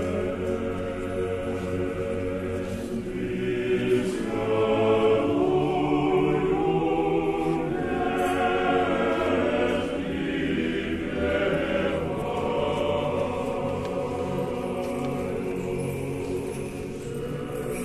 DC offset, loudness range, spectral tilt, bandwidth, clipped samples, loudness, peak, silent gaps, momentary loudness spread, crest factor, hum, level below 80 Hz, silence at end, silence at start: under 0.1%; 6 LU; -6.5 dB/octave; 13.5 kHz; under 0.1%; -26 LUFS; -12 dBFS; none; 8 LU; 14 dB; none; -46 dBFS; 0 s; 0 s